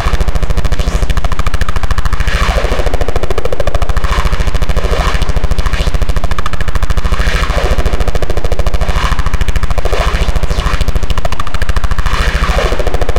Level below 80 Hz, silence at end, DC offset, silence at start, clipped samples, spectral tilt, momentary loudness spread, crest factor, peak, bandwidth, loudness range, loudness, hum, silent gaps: -12 dBFS; 0 s; under 0.1%; 0 s; under 0.1%; -5 dB/octave; 4 LU; 8 dB; 0 dBFS; 16 kHz; 1 LU; -16 LUFS; none; none